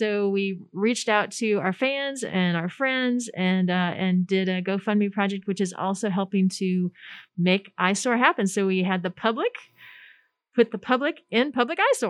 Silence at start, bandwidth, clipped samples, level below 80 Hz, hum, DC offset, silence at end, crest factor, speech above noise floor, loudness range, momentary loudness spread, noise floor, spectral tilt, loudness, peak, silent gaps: 0 s; 12 kHz; under 0.1%; -78 dBFS; none; under 0.1%; 0 s; 22 dB; 33 dB; 2 LU; 5 LU; -57 dBFS; -5 dB/octave; -24 LUFS; -4 dBFS; none